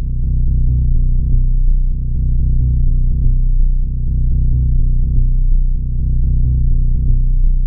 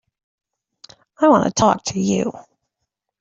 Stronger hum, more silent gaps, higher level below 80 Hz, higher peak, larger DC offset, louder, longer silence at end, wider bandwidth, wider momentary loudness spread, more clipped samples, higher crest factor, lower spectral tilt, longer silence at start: neither; neither; first, -12 dBFS vs -54 dBFS; about the same, -2 dBFS vs -2 dBFS; first, 1% vs under 0.1%; about the same, -18 LUFS vs -18 LUFS; second, 0 s vs 0.8 s; second, 0.6 kHz vs 8 kHz; second, 4 LU vs 7 LU; neither; second, 10 dB vs 20 dB; first, -19.5 dB/octave vs -5 dB/octave; second, 0 s vs 1.2 s